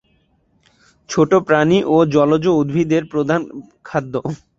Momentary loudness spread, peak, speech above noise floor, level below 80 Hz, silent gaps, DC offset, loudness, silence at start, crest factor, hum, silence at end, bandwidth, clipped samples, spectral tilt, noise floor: 11 LU; -2 dBFS; 44 dB; -54 dBFS; none; under 0.1%; -16 LUFS; 1.1 s; 16 dB; none; 0.25 s; 7.8 kHz; under 0.1%; -6.5 dB/octave; -60 dBFS